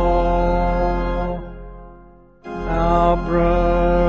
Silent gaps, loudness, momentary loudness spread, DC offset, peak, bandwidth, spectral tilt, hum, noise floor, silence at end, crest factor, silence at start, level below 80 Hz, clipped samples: none; -19 LUFS; 19 LU; under 0.1%; -4 dBFS; 6.6 kHz; -7 dB/octave; none; -46 dBFS; 0 s; 14 dB; 0 s; -24 dBFS; under 0.1%